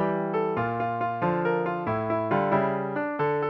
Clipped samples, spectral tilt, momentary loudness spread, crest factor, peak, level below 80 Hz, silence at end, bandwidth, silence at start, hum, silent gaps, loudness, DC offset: under 0.1%; -10 dB/octave; 4 LU; 16 dB; -10 dBFS; -62 dBFS; 0 s; 6 kHz; 0 s; none; none; -27 LUFS; under 0.1%